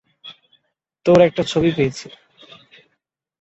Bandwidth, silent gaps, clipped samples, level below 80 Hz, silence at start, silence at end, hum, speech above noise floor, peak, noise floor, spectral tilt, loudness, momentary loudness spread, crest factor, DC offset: 8.2 kHz; none; under 0.1%; -52 dBFS; 0.25 s; 1.35 s; none; 57 dB; -2 dBFS; -73 dBFS; -6 dB/octave; -17 LUFS; 26 LU; 20 dB; under 0.1%